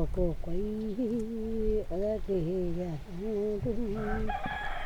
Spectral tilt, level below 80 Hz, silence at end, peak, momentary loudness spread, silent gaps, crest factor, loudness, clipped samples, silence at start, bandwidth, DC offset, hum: -8 dB/octave; -38 dBFS; 0 s; -16 dBFS; 4 LU; none; 14 dB; -33 LUFS; under 0.1%; 0 s; 9 kHz; under 0.1%; none